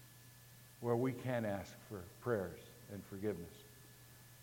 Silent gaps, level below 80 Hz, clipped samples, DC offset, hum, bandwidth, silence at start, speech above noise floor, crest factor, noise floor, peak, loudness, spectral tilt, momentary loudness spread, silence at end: none; -72 dBFS; under 0.1%; under 0.1%; none; 17 kHz; 0 s; 19 dB; 20 dB; -60 dBFS; -22 dBFS; -42 LUFS; -6.5 dB/octave; 21 LU; 0 s